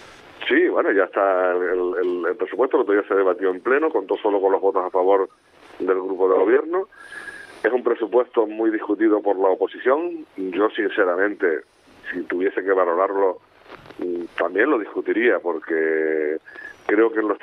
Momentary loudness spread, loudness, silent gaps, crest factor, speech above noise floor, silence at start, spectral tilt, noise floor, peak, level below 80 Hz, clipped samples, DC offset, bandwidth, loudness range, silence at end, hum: 11 LU; -21 LUFS; none; 16 dB; 24 dB; 0 s; -6 dB/octave; -44 dBFS; -6 dBFS; -68 dBFS; under 0.1%; under 0.1%; 9.8 kHz; 2 LU; 0.05 s; none